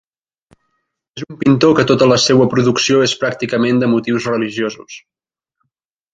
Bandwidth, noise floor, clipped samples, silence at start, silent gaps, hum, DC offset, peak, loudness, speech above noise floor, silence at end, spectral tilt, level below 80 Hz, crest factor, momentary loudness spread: 9.2 kHz; -75 dBFS; under 0.1%; 1.15 s; none; none; under 0.1%; 0 dBFS; -14 LUFS; 61 dB; 1.15 s; -5 dB/octave; -52 dBFS; 16 dB; 19 LU